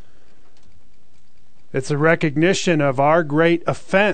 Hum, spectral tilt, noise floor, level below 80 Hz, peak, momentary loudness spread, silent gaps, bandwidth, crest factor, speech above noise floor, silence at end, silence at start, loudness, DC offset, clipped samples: none; -5.5 dB/octave; -59 dBFS; -54 dBFS; -2 dBFS; 7 LU; none; 9.2 kHz; 18 dB; 42 dB; 0 s; 1.75 s; -18 LUFS; 3%; under 0.1%